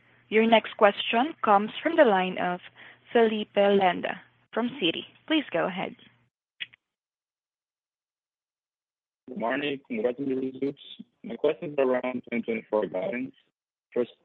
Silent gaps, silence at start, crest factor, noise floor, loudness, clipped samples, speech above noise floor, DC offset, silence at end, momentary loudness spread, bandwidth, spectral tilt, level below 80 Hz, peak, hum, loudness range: none; 0.3 s; 24 dB; under -90 dBFS; -26 LUFS; under 0.1%; over 64 dB; under 0.1%; 0.2 s; 17 LU; 4.4 kHz; -8 dB/octave; -76 dBFS; -4 dBFS; none; 13 LU